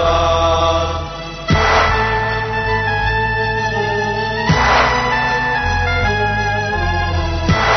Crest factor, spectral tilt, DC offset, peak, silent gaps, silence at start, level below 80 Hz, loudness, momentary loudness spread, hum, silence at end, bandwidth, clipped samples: 12 dB; -3 dB/octave; under 0.1%; -4 dBFS; none; 0 s; -26 dBFS; -16 LUFS; 6 LU; none; 0 s; 6.4 kHz; under 0.1%